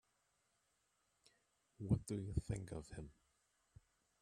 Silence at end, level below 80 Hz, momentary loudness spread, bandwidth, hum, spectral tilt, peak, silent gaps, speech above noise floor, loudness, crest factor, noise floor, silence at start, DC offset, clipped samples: 1.1 s; -60 dBFS; 15 LU; 13 kHz; none; -7.5 dB/octave; -24 dBFS; none; 39 dB; -44 LUFS; 24 dB; -83 dBFS; 1.8 s; under 0.1%; under 0.1%